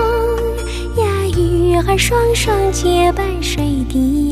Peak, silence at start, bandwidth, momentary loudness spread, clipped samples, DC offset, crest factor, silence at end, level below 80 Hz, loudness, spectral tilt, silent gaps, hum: -2 dBFS; 0 s; 15.5 kHz; 5 LU; under 0.1%; under 0.1%; 12 dB; 0 s; -22 dBFS; -15 LUFS; -5 dB/octave; none; none